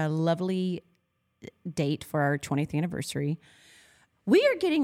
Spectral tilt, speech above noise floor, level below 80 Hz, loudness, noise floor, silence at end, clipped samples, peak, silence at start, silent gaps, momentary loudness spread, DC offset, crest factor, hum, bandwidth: -6.5 dB/octave; 46 dB; -66 dBFS; -28 LUFS; -73 dBFS; 0 s; under 0.1%; -12 dBFS; 0 s; none; 15 LU; under 0.1%; 18 dB; none; 16 kHz